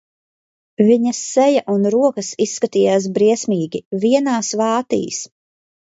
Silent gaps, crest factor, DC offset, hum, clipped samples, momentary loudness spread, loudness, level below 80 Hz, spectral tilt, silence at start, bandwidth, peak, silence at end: 3.85-3.91 s; 16 dB; under 0.1%; none; under 0.1%; 7 LU; -17 LUFS; -66 dBFS; -5 dB/octave; 0.8 s; 8 kHz; -2 dBFS; 0.65 s